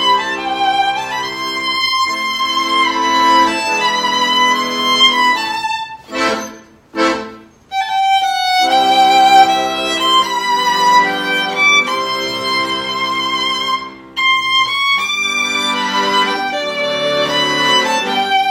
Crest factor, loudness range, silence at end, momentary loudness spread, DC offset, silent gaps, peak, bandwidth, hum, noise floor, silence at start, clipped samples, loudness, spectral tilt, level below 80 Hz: 14 dB; 4 LU; 0 s; 9 LU; under 0.1%; none; 0 dBFS; 16.5 kHz; none; -35 dBFS; 0 s; under 0.1%; -13 LUFS; -1.5 dB/octave; -54 dBFS